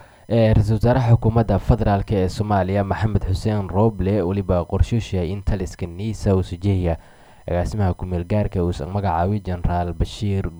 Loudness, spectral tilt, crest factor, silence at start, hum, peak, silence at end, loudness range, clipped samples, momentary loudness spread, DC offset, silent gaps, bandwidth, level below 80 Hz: -21 LUFS; -8 dB/octave; 18 dB; 0 s; none; -2 dBFS; 0 s; 5 LU; under 0.1%; 8 LU; under 0.1%; none; 11 kHz; -30 dBFS